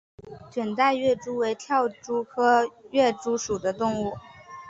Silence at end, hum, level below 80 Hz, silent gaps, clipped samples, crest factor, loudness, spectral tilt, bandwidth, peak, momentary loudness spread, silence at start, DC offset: 0 s; none; -60 dBFS; none; under 0.1%; 18 dB; -25 LUFS; -4 dB/octave; 8 kHz; -8 dBFS; 12 LU; 0.2 s; under 0.1%